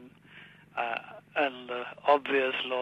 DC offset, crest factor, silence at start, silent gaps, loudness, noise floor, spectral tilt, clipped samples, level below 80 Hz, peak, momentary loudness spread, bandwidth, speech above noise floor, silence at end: under 0.1%; 20 dB; 0 s; none; -30 LUFS; -53 dBFS; -5 dB/octave; under 0.1%; -78 dBFS; -12 dBFS; 12 LU; 9 kHz; 24 dB; 0 s